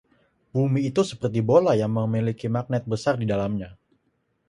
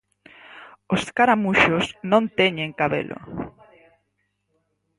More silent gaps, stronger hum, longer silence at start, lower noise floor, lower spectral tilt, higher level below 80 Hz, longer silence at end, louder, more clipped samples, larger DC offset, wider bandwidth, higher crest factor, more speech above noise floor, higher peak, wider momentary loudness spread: neither; second, none vs 50 Hz at -55 dBFS; about the same, 0.55 s vs 0.55 s; about the same, -71 dBFS vs -73 dBFS; first, -7.5 dB/octave vs -5.5 dB/octave; about the same, -56 dBFS vs -54 dBFS; second, 0.75 s vs 1.5 s; second, -24 LUFS vs -21 LUFS; neither; neither; about the same, 11.5 kHz vs 11.5 kHz; about the same, 20 dB vs 20 dB; second, 48 dB vs 52 dB; about the same, -4 dBFS vs -4 dBFS; second, 9 LU vs 16 LU